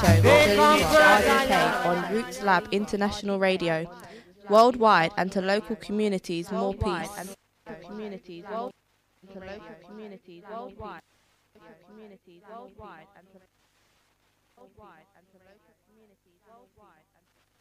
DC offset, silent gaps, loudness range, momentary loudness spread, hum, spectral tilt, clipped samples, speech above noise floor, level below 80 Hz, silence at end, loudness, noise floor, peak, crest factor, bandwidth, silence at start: under 0.1%; none; 24 LU; 27 LU; 50 Hz at -70 dBFS; -5 dB/octave; under 0.1%; 43 dB; -50 dBFS; 4.65 s; -22 LUFS; -69 dBFS; -4 dBFS; 22 dB; 15.5 kHz; 0 s